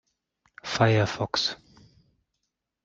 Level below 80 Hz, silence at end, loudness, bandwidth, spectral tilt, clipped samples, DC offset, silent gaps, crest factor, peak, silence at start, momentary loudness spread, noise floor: -60 dBFS; 1.3 s; -25 LUFS; 7.8 kHz; -5 dB/octave; under 0.1%; under 0.1%; none; 22 dB; -8 dBFS; 0.65 s; 17 LU; -81 dBFS